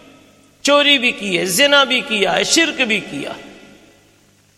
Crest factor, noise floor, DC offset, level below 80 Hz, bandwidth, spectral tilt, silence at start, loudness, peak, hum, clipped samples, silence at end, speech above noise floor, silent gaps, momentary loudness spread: 18 dB; -53 dBFS; under 0.1%; -58 dBFS; 15 kHz; -1.5 dB/octave; 0.65 s; -14 LUFS; 0 dBFS; 50 Hz at -60 dBFS; under 0.1%; 1.05 s; 38 dB; none; 16 LU